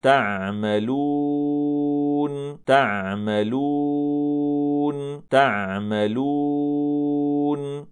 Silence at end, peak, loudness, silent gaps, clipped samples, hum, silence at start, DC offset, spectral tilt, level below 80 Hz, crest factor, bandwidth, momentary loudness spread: 0 s; -4 dBFS; -22 LUFS; none; under 0.1%; none; 0.05 s; under 0.1%; -7 dB/octave; -68 dBFS; 18 dB; 9.8 kHz; 6 LU